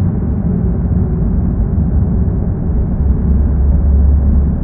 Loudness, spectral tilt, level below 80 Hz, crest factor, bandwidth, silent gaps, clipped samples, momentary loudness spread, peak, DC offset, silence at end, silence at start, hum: -14 LUFS; -14.5 dB/octave; -14 dBFS; 10 dB; 2 kHz; none; under 0.1%; 4 LU; -2 dBFS; under 0.1%; 0 s; 0 s; none